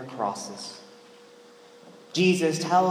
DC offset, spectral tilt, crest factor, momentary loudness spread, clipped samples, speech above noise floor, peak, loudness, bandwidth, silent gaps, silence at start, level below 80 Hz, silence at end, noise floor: under 0.1%; -5 dB/octave; 18 dB; 17 LU; under 0.1%; 27 dB; -10 dBFS; -25 LUFS; 15.5 kHz; none; 0 s; -82 dBFS; 0 s; -51 dBFS